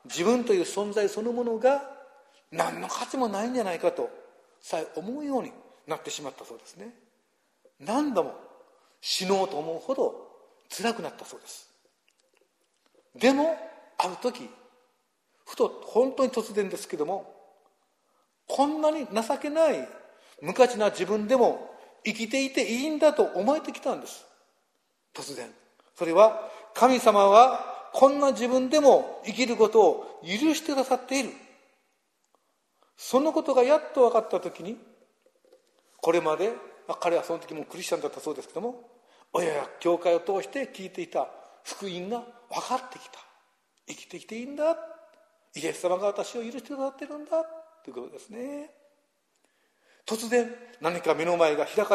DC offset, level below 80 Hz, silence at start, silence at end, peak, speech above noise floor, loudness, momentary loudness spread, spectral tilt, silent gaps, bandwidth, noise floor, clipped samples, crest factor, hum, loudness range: under 0.1%; -78 dBFS; 0.05 s; 0 s; -4 dBFS; 48 dB; -26 LUFS; 20 LU; -4 dB/octave; none; 14 kHz; -74 dBFS; under 0.1%; 24 dB; none; 12 LU